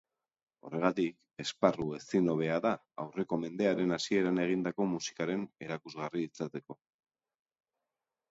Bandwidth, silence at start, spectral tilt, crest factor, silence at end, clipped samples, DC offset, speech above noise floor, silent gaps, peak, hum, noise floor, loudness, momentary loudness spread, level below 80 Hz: 8 kHz; 0.65 s; -5.5 dB/octave; 22 dB; 1.6 s; under 0.1%; under 0.1%; 57 dB; none; -12 dBFS; none; -90 dBFS; -33 LUFS; 11 LU; -70 dBFS